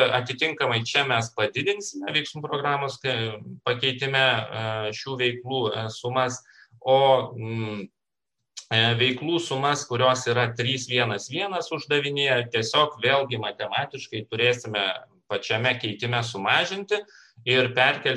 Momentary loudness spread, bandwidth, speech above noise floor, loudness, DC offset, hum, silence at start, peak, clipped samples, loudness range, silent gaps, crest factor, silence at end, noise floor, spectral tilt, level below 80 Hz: 10 LU; 11.5 kHz; 60 dB; -24 LUFS; under 0.1%; none; 0 s; -6 dBFS; under 0.1%; 2 LU; none; 20 dB; 0 s; -85 dBFS; -4 dB/octave; -66 dBFS